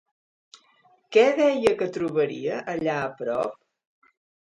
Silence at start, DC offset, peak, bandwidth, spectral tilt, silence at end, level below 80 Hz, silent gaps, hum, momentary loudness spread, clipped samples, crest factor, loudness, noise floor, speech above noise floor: 1.1 s; under 0.1%; -6 dBFS; 11 kHz; -5.5 dB/octave; 1 s; -64 dBFS; none; none; 9 LU; under 0.1%; 20 dB; -24 LUFS; -61 dBFS; 38 dB